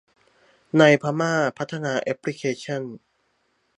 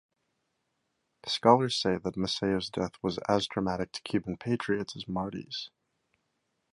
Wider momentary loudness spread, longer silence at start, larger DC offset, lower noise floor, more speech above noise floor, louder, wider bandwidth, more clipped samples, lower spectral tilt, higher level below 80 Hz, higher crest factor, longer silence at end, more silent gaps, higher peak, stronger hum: about the same, 14 LU vs 12 LU; second, 0.75 s vs 1.25 s; neither; second, -69 dBFS vs -79 dBFS; about the same, 47 dB vs 49 dB; first, -22 LUFS vs -30 LUFS; about the same, 11 kHz vs 11.5 kHz; neither; about the same, -5.5 dB/octave vs -5 dB/octave; second, -72 dBFS vs -60 dBFS; about the same, 22 dB vs 26 dB; second, 0.8 s vs 1.05 s; neither; first, -2 dBFS vs -6 dBFS; neither